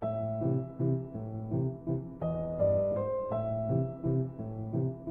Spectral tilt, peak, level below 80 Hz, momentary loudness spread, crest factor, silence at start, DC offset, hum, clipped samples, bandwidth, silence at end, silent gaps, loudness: -13 dB/octave; -18 dBFS; -54 dBFS; 7 LU; 14 dB; 0 s; under 0.1%; none; under 0.1%; 3.6 kHz; 0 s; none; -33 LUFS